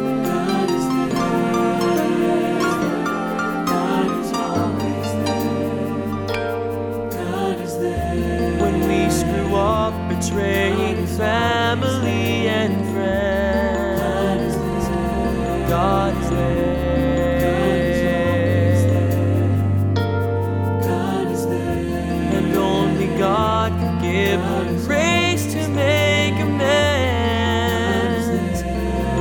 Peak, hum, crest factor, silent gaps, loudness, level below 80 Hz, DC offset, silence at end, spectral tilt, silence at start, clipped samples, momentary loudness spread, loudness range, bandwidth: -4 dBFS; none; 14 dB; none; -20 LUFS; -34 dBFS; under 0.1%; 0 s; -6 dB/octave; 0 s; under 0.1%; 5 LU; 3 LU; 20 kHz